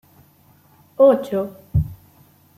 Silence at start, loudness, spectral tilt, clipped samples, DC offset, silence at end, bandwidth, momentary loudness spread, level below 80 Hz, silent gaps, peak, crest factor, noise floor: 1 s; -19 LUFS; -9 dB/octave; under 0.1%; under 0.1%; 0.65 s; 15 kHz; 15 LU; -40 dBFS; none; -2 dBFS; 18 dB; -54 dBFS